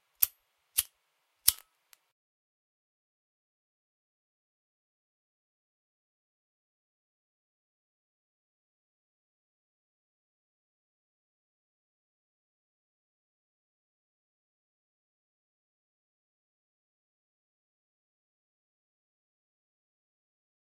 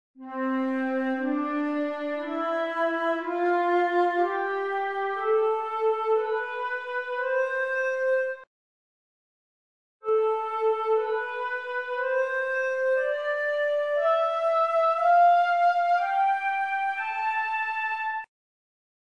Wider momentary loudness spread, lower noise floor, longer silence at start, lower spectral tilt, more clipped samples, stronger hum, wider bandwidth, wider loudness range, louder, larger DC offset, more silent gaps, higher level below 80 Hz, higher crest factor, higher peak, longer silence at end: first, 14 LU vs 8 LU; second, -77 dBFS vs under -90 dBFS; about the same, 0.2 s vs 0.2 s; second, 3 dB/octave vs -3.5 dB/octave; neither; neither; first, 15.5 kHz vs 9.6 kHz; second, 3 LU vs 6 LU; second, -29 LUFS vs -26 LUFS; second, under 0.1% vs 0.1%; second, none vs 8.47-10.00 s; first, -74 dBFS vs -80 dBFS; first, 44 dB vs 14 dB; first, 0 dBFS vs -12 dBFS; first, 19.1 s vs 0.8 s